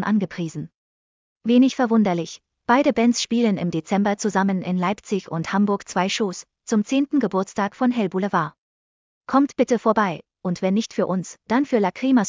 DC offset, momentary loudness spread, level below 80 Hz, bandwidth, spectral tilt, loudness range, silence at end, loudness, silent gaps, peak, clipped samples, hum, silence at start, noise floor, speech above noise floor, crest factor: under 0.1%; 10 LU; -62 dBFS; 7.6 kHz; -5.5 dB/octave; 3 LU; 0 s; -22 LUFS; 0.75-1.36 s, 8.58-9.21 s; -6 dBFS; under 0.1%; none; 0 s; under -90 dBFS; over 69 dB; 16 dB